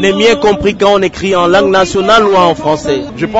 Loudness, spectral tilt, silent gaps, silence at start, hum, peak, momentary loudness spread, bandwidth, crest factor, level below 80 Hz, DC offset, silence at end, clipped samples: -9 LUFS; -4.5 dB/octave; none; 0 s; none; 0 dBFS; 6 LU; 8 kHz; 10 dB; -36 dBFS; under 0.1%; 0 s; 0.2%